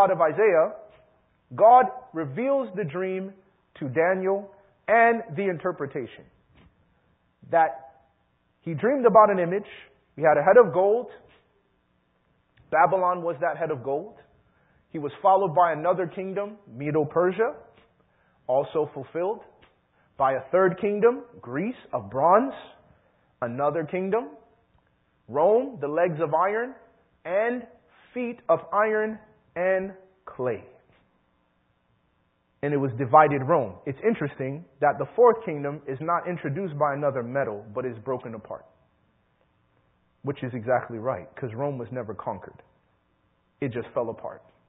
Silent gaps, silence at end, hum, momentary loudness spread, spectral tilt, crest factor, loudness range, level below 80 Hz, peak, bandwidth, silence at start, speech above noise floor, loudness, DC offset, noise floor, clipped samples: none; 0.3 s; none; 16 LU; -11.5 dB/octave; 22 dB; 9 LU; -66 dBFS; -4 dBFS; 4 kHz; 0 s; 45 dB; -25 LUFS; under 0.1%; -69 dBFS; under 0.1%